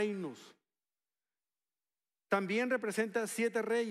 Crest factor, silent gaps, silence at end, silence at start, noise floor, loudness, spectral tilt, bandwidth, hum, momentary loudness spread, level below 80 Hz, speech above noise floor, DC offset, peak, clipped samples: 18 dB; none; 0 s; 0 s; under -90 dBFS; -34 LUFS; -4.5 dB/octave; 15.5 kHz; none; 10 LU; under -90 dBFS; over 55 dB; under 0.1%; -18 dBFS; under 0.1%